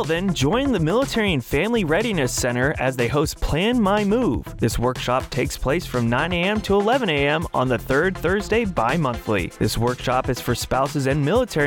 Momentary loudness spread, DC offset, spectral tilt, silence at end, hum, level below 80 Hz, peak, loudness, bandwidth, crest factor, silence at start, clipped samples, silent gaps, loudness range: 4 LU; under 0.1%; -5 dB/octave; 0 s; none; -36 dBFS; -8 dBFS; -21 LUFS; 19.5 kHz; 14 dB; 0 s; under 0.1%; none; 1 LU